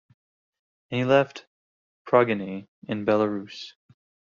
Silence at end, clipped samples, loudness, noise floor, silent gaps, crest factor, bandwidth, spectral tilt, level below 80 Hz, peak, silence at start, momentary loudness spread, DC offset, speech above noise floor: 0.6 s; under 0.1%; -24 LUFS; under -90 dBFS; 1.47-2.05 s, 2.68-2.82 s; 22 dB; 7.2 kHz; -5 dB/octave; -68 dBFS; -6 dBFS; 0.9 s; 18 LU; under 0.1%; over 66 dB